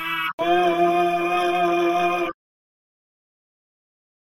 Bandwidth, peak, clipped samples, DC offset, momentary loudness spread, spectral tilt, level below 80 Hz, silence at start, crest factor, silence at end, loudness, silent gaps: 15.5 kHz; -8 dBFS; under 0.1%; under 0.1%; 5 LU; -5 dB/octave; -64 dBFS; 0 s; 14 dB; 2.05 s; -21 LUFS; 0.33-0.38 s